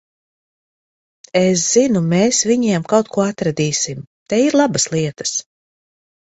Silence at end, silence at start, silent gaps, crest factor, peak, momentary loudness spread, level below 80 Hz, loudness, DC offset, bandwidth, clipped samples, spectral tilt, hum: 0.9 s; 1.35 s; 4.07-4.26 s; 18 dB; 0 dBFS; 8 LU; -56 dBFS; -16 LUFS; under 0.1%; 8.4 kHz; under 0.1%; -4 dB/octave; none